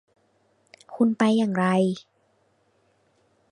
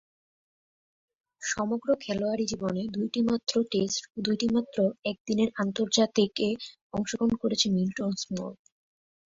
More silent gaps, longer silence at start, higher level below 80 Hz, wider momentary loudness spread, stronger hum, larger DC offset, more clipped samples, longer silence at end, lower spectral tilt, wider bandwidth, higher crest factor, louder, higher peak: second, none vs 4.99-5.03 s, 5.20-5.25 s, 6.82-6.90 s; second, 0.9 s vs 1.4 s; second, -72 dBFS vs -62 dBFS; first, 13 LU vs 8 LU; neither; neither; neither; first, 1.5 s vs 0.85 s; first, -7 dB/octave vs -4.5 dB/octave; first, 10.5 kHz vs 7.8 kHz; about the same, 20 dB vs 20 dB; first, -23 LUFS vs -28 LUFS; first, -6 dBFS vs -10 dBFS